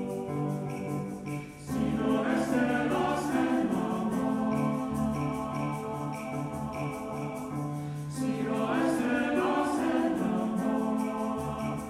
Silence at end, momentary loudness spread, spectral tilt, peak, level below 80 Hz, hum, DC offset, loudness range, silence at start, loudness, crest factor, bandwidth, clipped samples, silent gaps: 0 s; 8 LU; -6.5 dB/octave; -14 dBFS; -54 dBFS; none; under 0.1%; 5 LU; 0 s; -30 LUFS; 16 dB; 15 kHz; under 0.1%; none